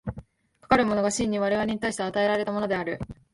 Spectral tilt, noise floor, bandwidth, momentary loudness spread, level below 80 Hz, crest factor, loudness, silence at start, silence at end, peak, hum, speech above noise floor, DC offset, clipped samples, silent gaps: -4.5 dB/octave; -58 dBFS; 11.5 kHz; 11 LU; -50 dBFS; 22 dB; -25 LUFS; 0.05 s; 0.2 s; -6 dBFS; none; 32 dB; under 0.1%; under 0.1%; none